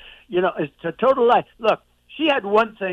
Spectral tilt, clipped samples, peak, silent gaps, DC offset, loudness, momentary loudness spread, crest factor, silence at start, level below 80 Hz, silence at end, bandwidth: -6.5 dB/octave; under 0.1%; -6 dBFS; none; under 0.1%; -20 LUFS; 9 LU; 16 dB; 0.05 s; -58 dBFS; 0 s; 7.6 kHz